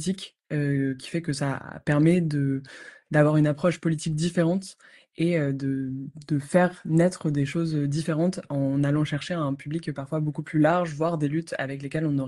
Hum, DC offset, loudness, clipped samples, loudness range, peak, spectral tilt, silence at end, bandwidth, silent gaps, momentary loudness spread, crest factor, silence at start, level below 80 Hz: none; under 0.1%; -26 LUFS; under 0.1%; 2 LU; -8 dBFS; -7 dB/octave; 0 s; 11.5 kHz; none; 9 LU; 18 dB; 0 s; -62 dBFS